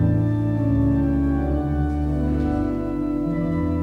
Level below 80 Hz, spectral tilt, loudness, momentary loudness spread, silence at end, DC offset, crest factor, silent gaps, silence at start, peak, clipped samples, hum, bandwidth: -28 dBFS; -10.5 dB/octave; -22 LUFS; 4 LU; 0 s; under 0.1%; 12 dB; none; 0 s; -10 dBFS; under 0.1%; none; 5.2 kHz